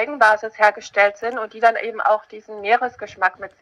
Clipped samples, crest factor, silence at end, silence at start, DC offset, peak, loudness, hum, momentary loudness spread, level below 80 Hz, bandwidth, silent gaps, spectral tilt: under 0.1%; 18 dB; 0.15 s; 0 s; under 0.1%; -2 dBFS; -19 LUFS; none; 10 LU; -66 dBFS; 11 kHz; none; -2.5 dB/octave